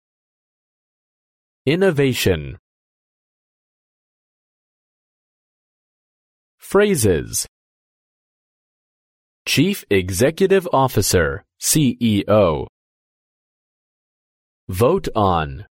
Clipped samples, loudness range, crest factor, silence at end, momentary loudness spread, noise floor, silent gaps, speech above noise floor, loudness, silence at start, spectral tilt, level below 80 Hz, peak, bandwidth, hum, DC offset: under 0.1%; 6 LU; 18 dB; 0.1 s; 9 LU; under -90 dBFS; 2.59-6.58 s, 7.48-9.45 s, 12.69-14.67 s; over 73 dB; -18 LUFS; 1.65 s; -4.5 dB/octave; -42 dBFS; -2 dBFS; 16.5 kHz; none; under 0.1%